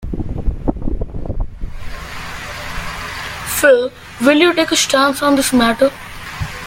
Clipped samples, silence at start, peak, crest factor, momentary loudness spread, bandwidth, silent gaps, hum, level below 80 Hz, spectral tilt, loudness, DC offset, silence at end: under 0.1%; 0 s; 0 dBFS; 16 dB; 17 LU; 17 kHz; none; none; -28 dBFS; -3.5 dB/octave; -16 LUFS; under 0.1%; 0 s